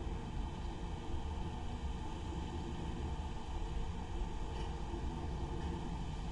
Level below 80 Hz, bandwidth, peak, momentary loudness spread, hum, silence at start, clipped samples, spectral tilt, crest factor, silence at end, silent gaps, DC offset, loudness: -42 dBFS; 11 kHz; -28 dBFS; 2 LU; none; 0 s; under 0.1%; -6.5 dB/octave; 12 dB; 0 s; none; under 0.1%; -44 LUFS